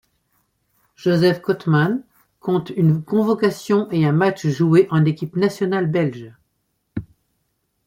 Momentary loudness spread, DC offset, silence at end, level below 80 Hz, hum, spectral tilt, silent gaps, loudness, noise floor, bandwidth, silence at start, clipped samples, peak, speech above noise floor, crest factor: 13 LU; under 0.1%; 0.85 s; -58 dBFS; none; -7.5 dB/octave; none; -19 LUFS; -71 dBFS; 15.5 kHz; 1 s; under 0.1%; -2 dBFS; 53 dB; 16 dB